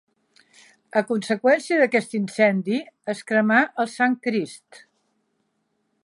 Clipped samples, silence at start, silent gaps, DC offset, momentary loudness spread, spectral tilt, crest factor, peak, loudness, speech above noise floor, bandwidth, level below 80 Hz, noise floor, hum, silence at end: under 0.1%; 0.95 s; none; under 0.1%; 9 LU; -5.5 dB/octave; 18 dB; -4 dBFS; -22 LUFS; 51 dB; 11.5 kHz; -78 dBFS; -72 dBFS; none; 1.5 s